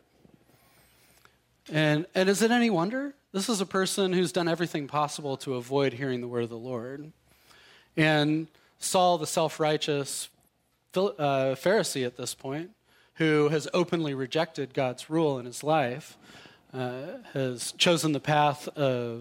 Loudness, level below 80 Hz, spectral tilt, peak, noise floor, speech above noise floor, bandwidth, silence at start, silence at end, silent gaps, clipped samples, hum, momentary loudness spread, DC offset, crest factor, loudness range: -28 LUFS; -72 dBFS; -4.5 dB/octave; -10 dBFS; -69 dBFS; 42 dB; 16.5 kHz; 1.65 s; 0 s; none; under 0.1%; none; 12 LU; under 0.1%; 18 dB; 4 LU